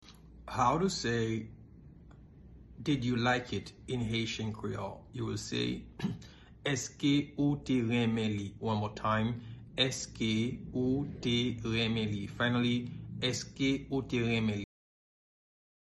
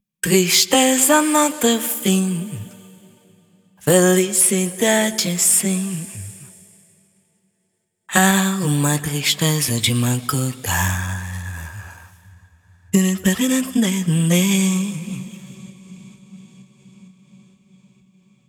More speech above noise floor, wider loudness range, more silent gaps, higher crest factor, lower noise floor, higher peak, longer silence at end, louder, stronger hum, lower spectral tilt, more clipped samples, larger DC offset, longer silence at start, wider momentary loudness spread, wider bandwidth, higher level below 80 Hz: second, 22 dB vs 54 dB; second, 3 LU vs 6 LU; neither; about the same, 18 dB vs 20 dB; second, -54 dBFS vs -71 dBFS; second, -14 dBFS vs 0 dBFS; second, 1.3 s vs 1.45 s; second, -33 LUFS vs -17 LUFS; neither; first, -5 dB/octave vs -3.5 dB/octave; neither; neither; second, 0.05 s vs 0.25 s; second, 10 LU vs 17 LU; second, 12 kHz vs over 20 kHz; about the same, -56 dBFS vs -52 dBFS